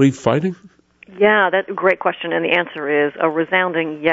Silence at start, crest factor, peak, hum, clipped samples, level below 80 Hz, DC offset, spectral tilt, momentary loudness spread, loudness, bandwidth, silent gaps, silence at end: 0 s; 16 dB; -2 dBFS; none; under 0.1%; -60 dBFS; under 0.1%; -6 dB/octave; 6 LU; -17 LUFS; 8 kHz; none; 0 s